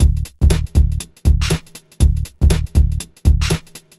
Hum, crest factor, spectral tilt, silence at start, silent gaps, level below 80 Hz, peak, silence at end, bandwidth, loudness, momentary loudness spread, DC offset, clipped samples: none; 16 dB; -5.5 dB/octave; 0 s; none; -16 dBFS; 0 dBFS; 0.2 s; 13 kHz; -18 LUFS; 5 LU; 0.5%; under 0.1%